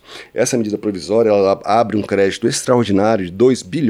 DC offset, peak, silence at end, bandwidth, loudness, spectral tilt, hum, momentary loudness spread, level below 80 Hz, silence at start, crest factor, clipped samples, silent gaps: under 0.1%; -2 dBFS; 0 s; 15 kHz; -16 LUFS; -5 dB/octave; none; 6 LU; -54 dBFS; 0.1 s; 14 dB; under 0.1%; none